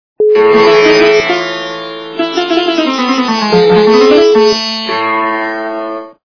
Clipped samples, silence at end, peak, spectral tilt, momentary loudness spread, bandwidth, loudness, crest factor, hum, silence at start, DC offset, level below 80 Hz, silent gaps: 0.6%; 0.25 s; 0 dBFS; -4.5 dB/octave; 13 LU; 5.4 kHz; -9 LUFS; 10 dB; none; 0.2 s; 0.2%; -48 dBFS; none